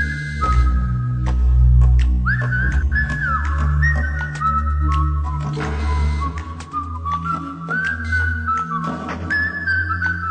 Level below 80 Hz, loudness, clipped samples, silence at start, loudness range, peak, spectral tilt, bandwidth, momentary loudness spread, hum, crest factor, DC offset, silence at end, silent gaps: -20 dBFS; -20 LUFS; under 0.1%; 0 s; 5 LU; -4 dBFS; -7 dB/octave; 8.8 kHz; 8 LU; none; 14 dB; under 0.1%; 0 s; none